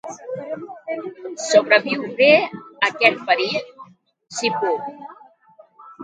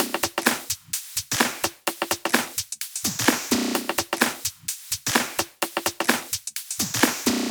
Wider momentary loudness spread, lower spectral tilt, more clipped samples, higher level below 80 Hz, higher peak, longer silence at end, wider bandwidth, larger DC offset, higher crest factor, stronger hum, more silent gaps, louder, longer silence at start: first, 18 LU vs 7 LU; first, -3 dB/octave vs -1.5 dB/octave; neither; second, -74 dBFS vs -58 dBFS; about the same, 0 dBFS vs -2 dBFS; about the same, 0 s vs 0 s; second, 9.4 kHz vs over 20 kHz; neither; about the same, 22 dB vs 24 dB; neither; neither; first, -19 LUFS vs -24 LUFS; about the same, 0.05 s vs 0 s